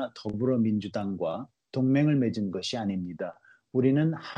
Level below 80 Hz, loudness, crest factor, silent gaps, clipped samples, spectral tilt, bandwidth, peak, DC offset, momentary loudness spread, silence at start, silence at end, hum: -66 dBFS; -28 LUFS; 16 dB; none; under 0.1%; -7.5 dB/octave; 9.6 kHz; -12 dBFS; under 0.1%; 12 LU; 0 s; 0 s; none